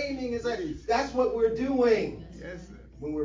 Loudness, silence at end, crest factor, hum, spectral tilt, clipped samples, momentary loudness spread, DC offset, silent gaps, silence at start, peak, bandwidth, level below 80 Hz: -27 LUFS; 0 s; 16 dB; none; -5.5 dB/octave; under 0.1%; 18 LU; under 0.1%; none; 0 s; -12 dBFS; 7.6 kHz; -48 dBFS